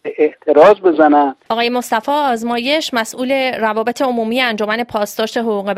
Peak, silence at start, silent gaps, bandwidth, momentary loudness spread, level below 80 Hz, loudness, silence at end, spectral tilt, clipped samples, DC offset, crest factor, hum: 0 dBFS; 0.05 s; none; 16 kHz; 9 LU; -60 dBFS; -15 LUFS; 0 s; -4 dB/octave; under 0.1%; under 0.1%; 14 dB; none